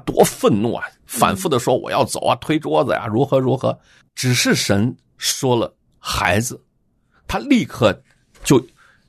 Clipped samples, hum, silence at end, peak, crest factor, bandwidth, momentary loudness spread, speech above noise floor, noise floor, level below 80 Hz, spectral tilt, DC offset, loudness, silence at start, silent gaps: under 0.1%; none; 0.4 s; -2 dBFS; 18 dB; 14 kHz; 11 LU; 44 dB; -62 dBFS; -46 dBFS; -4.5 dB/octave; under 0.1%; -19 LUFS; 0.05 s; none